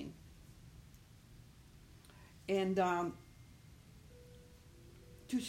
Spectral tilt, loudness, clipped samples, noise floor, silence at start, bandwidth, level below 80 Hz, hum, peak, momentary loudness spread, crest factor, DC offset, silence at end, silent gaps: -5.5 dB/octave; -37 LUFS; under 0.1%; -60 dBFS; 0 s; 16 kHz; -64 dBFS; none; -22 dBFS; 26 LU; 22 dB; under 0.1%; 0 s; none